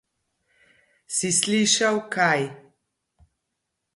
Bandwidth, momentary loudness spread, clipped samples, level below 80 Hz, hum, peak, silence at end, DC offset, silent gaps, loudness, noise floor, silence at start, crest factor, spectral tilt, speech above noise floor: 11.5 kHz; 8 LU; under 0.1%; -68 dBFS; none; -6 dBFS; 1.35 s; under 0.1%; none; -22 LUFS; -80 dBFS; 1.1 s; 20 dB; -2.5 dB/octave; 58 dB